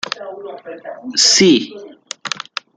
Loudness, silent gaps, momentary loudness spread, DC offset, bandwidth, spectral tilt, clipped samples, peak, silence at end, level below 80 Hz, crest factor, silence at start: -13 LUFS; none; 22 LU; under 0.1%; 11 kHz; -2.5 dB/octave; under 0.1%; 0 dBFS; 0.4 s; -64 dBFS; 18 dB; 0.05 s